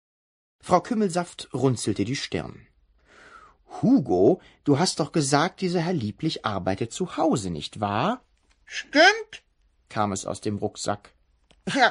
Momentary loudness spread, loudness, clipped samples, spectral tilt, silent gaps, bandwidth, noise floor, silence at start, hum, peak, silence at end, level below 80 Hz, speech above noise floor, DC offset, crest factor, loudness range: 15 LU; -25 LUFS; under 0.1%; -4.5 dB/octave; none; 11 kHz; -61 dBFS; 0.65 s; none; -4 dBFS; 0 s; -58 dBFS; 37 dB; under 0.1%; 22 dB; 4 LU